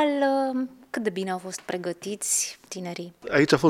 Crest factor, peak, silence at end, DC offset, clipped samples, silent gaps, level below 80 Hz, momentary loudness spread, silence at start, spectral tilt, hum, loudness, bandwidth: 22 dB; -4 dBFS; 0 s; under 0.1%; under 0.1%; none; -62 dBFS; 12 LU; 0 s; -3.5 dB/octave; none; -27 LUFS; 16.5 kHz